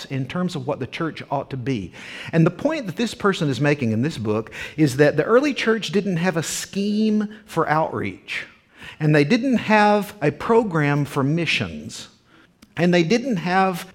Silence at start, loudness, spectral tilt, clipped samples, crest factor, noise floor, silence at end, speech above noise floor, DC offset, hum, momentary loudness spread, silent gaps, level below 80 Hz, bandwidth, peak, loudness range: 0 s; -21 LUFS; -6 dB/octave; under 0.1%; 18 dB; -53 dBFS; 0.05 s; 33 dB; under 0.1%; none; 12 LU; none; -56 dBFS; 16.5 kHz; -2 dBFS; 4 LU